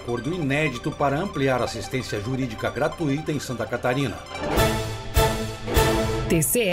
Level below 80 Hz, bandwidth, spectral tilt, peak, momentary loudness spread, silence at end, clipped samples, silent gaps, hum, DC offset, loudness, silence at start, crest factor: -34 dBFS; 16 kHz; -5 dB/octave; -6 dBFS; 7 LU; 0 s; under 0.1%; none; none; under 0.1%; -24 LUFS; 0 s; 18 dB